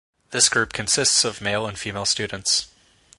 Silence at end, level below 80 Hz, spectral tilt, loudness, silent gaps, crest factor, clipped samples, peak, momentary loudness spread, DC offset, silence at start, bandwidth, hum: 0.5 s; -52 dBFS; -1 dB/octave; -20 LUFS; none; 22 dB; under 0.1%; -2 dBFS; 8 LU; under 0.1%; 0.3 s; 11.5 kHz; none